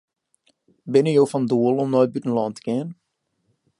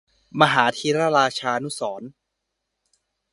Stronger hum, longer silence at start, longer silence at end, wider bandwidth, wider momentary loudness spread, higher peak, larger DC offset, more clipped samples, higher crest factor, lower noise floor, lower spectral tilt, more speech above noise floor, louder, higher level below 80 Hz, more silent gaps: neither; first, 0.85 s vs 0.35 s; second, 0.85 s vs 1.2 s; about the same, 11.5 kHz vs 11.5 kHz; second, 9 LU vs 14 LU; second, -4 dBFS vs 0 dBFS; neither; neither; second, 18 dB vs 24 dB; second, -71 dBFS vs -79 dBFS; first, -7.5 dB/octave vs -4 dB/octave; second, 51 dB vs 58 dB; about the same, -21 LUFS vs -21 LUFS; second, -72 dBFS vs -66 dBFS; neither